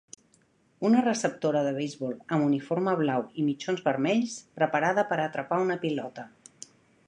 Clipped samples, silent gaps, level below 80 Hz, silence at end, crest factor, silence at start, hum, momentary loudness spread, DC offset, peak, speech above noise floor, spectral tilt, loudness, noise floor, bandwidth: under 0.1%; none; -76 dBFS; 0.8 s; 18 dB; 0.8 s; none; 15 LU; under 0.1%; -10 dBFS; 38 dB; -5.5 dB/octave; -28 LUFS; -65 dBFS; 10.5 kHz